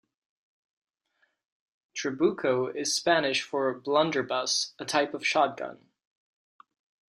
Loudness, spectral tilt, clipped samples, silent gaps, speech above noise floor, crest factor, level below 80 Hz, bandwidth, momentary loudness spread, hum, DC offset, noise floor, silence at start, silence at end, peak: -27 LUFS; -2.5 dB/octave; under 0.1%; none; 46 dB; 22 dB; -76 dBFS; 14 kHz; 9 LU; none; under 0.1%; -74 dBFS; 1.95 s; 1.45 s; -8 dBFS